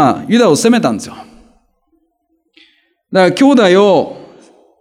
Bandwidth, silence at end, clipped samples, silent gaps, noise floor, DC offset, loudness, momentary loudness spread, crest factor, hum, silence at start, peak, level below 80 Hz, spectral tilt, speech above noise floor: 15 kHz; 0.55 s; under 0.1%; none; -63 dBFS; under 0.1%; -10 LUFS; 13 LU; 12 dB; none; 0 s; 0 dBFS; -58 dBFS; -5 dB/octave; 53 dB